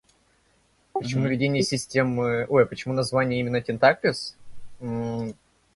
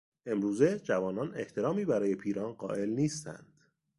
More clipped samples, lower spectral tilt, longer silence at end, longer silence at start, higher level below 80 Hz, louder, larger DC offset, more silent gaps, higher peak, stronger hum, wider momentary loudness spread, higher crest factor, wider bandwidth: neither; about the same, -5.5 dB/octave vs -6.5 dB/octave; second, 0.45 s vs 0.6 s; first, 0.95 s vs 0.25 s; first, -56 dBFS vs -68 dBFS; first, -24 LUFS vs -32 LUFS; neither; neither; first, -4 dBFS vs -12 dBFS; neither; first, 13 LU vs 8 LU; about the same, 22 dB vs 20 dB; about the same, 11.5 kHz vs 11.5 kHz